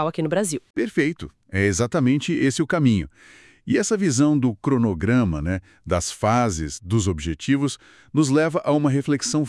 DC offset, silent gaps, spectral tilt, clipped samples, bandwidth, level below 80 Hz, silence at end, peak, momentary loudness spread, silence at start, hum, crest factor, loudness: under 0.1%; 0.70-0.74 s; -5.5 dB/octave; under 0.1%; 12 kHz; -46 dBFS; 0 s; -6 dBFS; 8 LU; 0 s; none; 16 dB; -22 LUFS